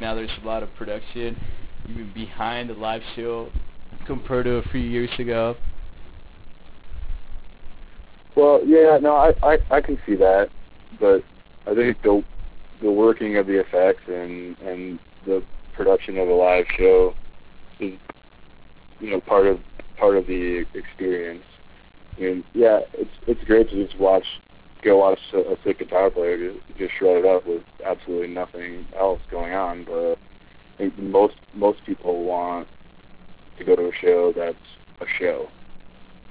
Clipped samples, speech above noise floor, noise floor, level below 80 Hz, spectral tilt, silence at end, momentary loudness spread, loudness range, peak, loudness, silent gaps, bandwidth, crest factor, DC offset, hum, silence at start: under 0.1%; 25 dB; -45 dBFS; -40 dBFS; -10 dB/octave; 0 s; 17 LU; 9 LU; -4 dBFS; -21 LUFS; none; 4 kHz; 18 dB; 0.2%; none; 0 s